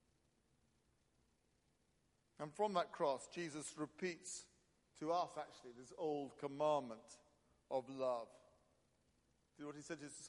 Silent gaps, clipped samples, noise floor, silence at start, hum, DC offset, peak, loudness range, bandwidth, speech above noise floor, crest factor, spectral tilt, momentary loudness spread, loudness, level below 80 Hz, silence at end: none; under 0.1%; -80 dBFS; 2.4 s; none; under 0.1%; -26 dBFS; 3 LU; 11.5 kHz; 36 dB; 22 dB; -4.5 dB/octave; 15 LU; -45 LUFS; -86 dBFS; 0 s